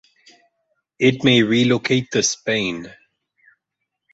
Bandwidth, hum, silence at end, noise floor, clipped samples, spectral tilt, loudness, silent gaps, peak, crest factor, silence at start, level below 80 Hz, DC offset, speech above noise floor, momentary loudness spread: 8 kHz; none; 1.2 s; -79 dBFS; under 0.1%; -4 dB/octave; -18 LUFS; none; -2 dBFS; 18 dB; 1 s; -58 dBFS; under 0.1%; 62 dB; 11 LU